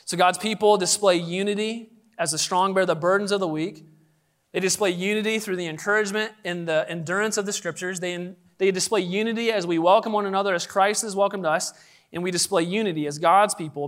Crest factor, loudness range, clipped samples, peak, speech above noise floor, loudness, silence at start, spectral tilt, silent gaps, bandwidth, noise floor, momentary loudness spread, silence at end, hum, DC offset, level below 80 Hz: 18 dB; 3 LU; under 0.1%; -6 dBFS; 42 dB; -23 LUFS; 0.05 s; -3.5 dB/octave; none; 16 kHz; -65 dBFS; 10 LU; 0 s; none; under 0.1%; -76 dBFS